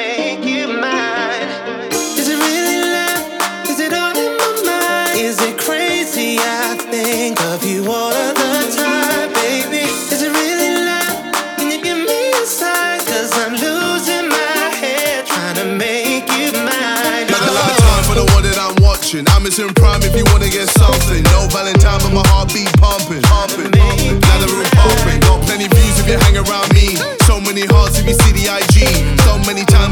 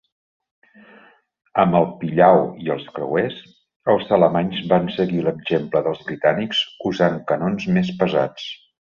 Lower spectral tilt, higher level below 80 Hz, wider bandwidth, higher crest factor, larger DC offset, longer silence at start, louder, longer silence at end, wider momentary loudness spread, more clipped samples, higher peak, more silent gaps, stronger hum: second, -4 dB/octave vs -7 dB/octave; first, -18 dBFS vs -56 dBFS; first, over 20 kHz vs 7.2 kHz; second, 12 dB vs 18 dB; neither; second, 0 s vs 1.55 s; first, -13 LUFS vs -20 LUFS; second, 0 s vs 0.35 s; second, 6 LU vs 10 LU; neither; about the same, 0 dBFS vs -2 dBFS; second, none vs 3.76-3.80 s; neither